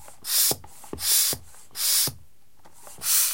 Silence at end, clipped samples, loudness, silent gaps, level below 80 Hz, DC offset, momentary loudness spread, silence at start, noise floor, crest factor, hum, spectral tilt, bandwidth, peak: 0 s; under 0.1%; -22 LUFS; none; -60 dBFS; 0.6%; 12 LU; 0.25 s; -58 dBFS; 20 dB; none; 0.5 dB/octave; 16.5 kHz; -8 dBFS